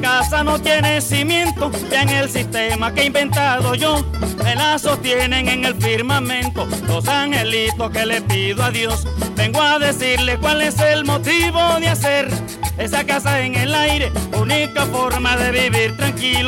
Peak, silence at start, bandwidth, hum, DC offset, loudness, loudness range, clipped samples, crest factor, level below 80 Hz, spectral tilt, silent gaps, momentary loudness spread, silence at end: -4 dBFS; 0 s; 17 kHz; none; under 0.1%; -17 LUFS; 2 LU; under 0.1%; 12 dB; -30 dBFS; -4 dB/octave; none; 5 LU; 0 s